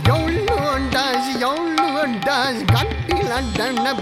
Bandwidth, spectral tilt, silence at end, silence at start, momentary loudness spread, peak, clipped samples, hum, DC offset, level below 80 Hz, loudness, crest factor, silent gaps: 16 kHz; -5 dB/octave; 0 s; 0 s; 3 LU; -2 dBFS; under 0.1%; none; under 0.1%; -34 dBFS; -19 LUFS; 16 dB; none